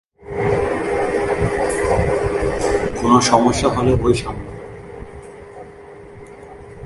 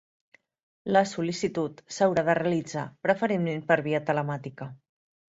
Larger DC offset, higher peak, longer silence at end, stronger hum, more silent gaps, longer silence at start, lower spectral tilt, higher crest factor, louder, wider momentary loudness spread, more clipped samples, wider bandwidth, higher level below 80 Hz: neither; first, 0 dBFS vs -8 dBFS; second, 0 s vs 0.65 s; neither; neither; second, 0.2 s vs 0.85 s; about the same, -5.5 dB/octave vs -6 dB/octave; about the same, 18 dB vs 20 dB; first, -18 LUFS vs -27 LUFS; first, 24 LU vs 11 LU; neither; first, 11.5 kHz vs 8 kHz; first, -34 dBFS vs -66 dBFS